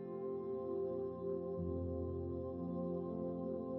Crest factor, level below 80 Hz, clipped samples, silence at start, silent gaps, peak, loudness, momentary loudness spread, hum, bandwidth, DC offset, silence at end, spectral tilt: 10 dB; -60 dBFS; under 0.1%; 0 s; none; -30 dBFS; -42 LUFS; 2 LU; none; 4.1 kHz; under 0.1%; 0 s; -12 dB/octave